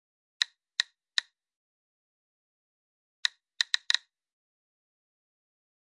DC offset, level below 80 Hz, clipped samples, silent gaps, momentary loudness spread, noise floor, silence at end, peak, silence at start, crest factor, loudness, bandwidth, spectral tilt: under 0.1%; under -90 dBFS; under 0.1%; 1.56-3.23 s; 5 LU; under -90 dBFS; 2 s; -8 dBFS; 0.4 s; 30 dB; -30 LUFS; 11.5 kHz; 8 dB/octave